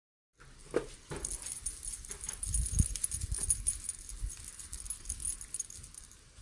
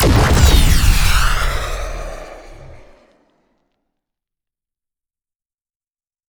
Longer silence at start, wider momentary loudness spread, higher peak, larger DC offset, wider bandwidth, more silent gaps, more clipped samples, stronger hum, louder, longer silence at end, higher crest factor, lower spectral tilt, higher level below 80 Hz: first, 0.4 s vs 0 s; second, 13 LU vs 21 LU; second, -14 dBFS vs 0 dBFS; neither; second, 11.5 kHz vs over 20 kHz; neither; neither; neither; second, -36 LUFS vs -15 LUFS; second, 0 s vs 3.55 s; first, 26 dB vs 16 dB; second, -3 dB/octave vs -4.5 dB/octave; second, -44 dBFS vs -20 dBFS